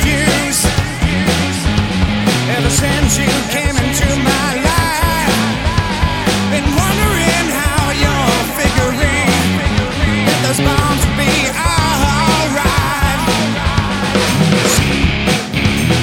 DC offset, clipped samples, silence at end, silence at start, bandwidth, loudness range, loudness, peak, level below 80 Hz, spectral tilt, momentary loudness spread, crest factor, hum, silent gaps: under 0.1%; under 0.1%; 0 s; 0 s; 18 kHz; 1 LU; -13 LUFS; 0 dBFS; -22 dBFS; -4 dB/octave; 3 LU; 14 dB; none; none